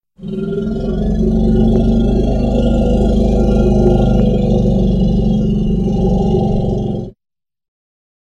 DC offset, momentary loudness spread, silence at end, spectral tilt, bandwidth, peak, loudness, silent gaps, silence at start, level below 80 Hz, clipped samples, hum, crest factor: under 0.1%; 7 LU; 1.1 s; -9.5 dB/octave; 7.4 kHz; -2 dBFS; -14 LUFS; none; 0.2 s; -18 dBFS; under 0.1%; none; 12 dB